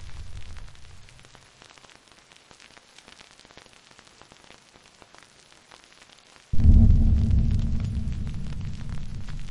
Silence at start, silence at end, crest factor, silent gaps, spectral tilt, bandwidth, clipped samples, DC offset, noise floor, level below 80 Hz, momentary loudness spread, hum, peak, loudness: 0 s; 0 s; 20 dB; none; -7.5 dB/octave; 10.5 kHz; under 0.1%; under 0.1%; -54 dBFS; -28 dBFS; 30 LU; none; -4 dBFS; -25 LUFS